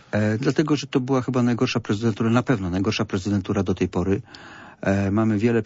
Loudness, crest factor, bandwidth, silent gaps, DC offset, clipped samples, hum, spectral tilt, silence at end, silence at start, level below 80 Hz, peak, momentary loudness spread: -23 LUFS; 16 dB; 8 kHz; none; under 0.1%; under 0.1%; none; -6.5 dB/octave; 0 s; 0.15 s; -52 dBFS; -6 dBFS; 5 LU